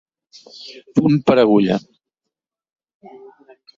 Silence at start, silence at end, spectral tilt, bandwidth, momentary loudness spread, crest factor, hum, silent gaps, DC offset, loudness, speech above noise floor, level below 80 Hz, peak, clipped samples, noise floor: 0.6 s; 2 s; -8 dB/octave; 7.6 kHz; 23 LU; 18 dB; none; none; under 0.1%; -16 LUFS; 66 dB; -58 dBFS; -2 dBFS; under 0.1%; -83 dBFS